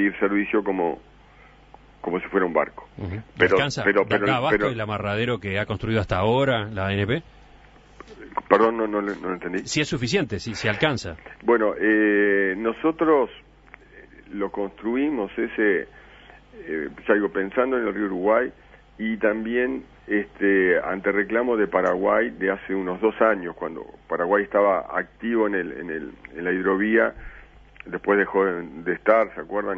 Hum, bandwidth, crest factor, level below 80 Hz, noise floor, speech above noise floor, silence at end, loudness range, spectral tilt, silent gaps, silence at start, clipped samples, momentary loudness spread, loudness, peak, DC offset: none; 8 kHz; 24 dB; -50 dBFS; -51 dBFS; 28 dB; 0 s; 3 LU; -6 dB/octave; none; 0 s; under 0.1%; 11 LU; -23 LUFS; 0 dBFS; under 0.1%